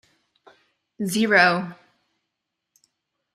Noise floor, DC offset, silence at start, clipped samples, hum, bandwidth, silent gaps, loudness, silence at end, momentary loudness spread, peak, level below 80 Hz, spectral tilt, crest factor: -81 dBFS; under 0.1%; 1 s; under 0.1%; none; 14 kHz; none; -20 LUFS; 1.6 s; 16 LU; -4 dBFS; -70 dBFS; -4 dB/octave; 22 dB